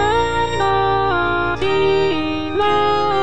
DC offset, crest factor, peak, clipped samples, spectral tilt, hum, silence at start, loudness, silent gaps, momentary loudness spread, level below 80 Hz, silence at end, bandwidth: 3%; 12 dB; -6 dBFS; under 0.1%; -5.5 dB/octave; none; 0 s; -17 LUFS; none; 3 LU; -36 dBFS; 0 s; 9.2 kHz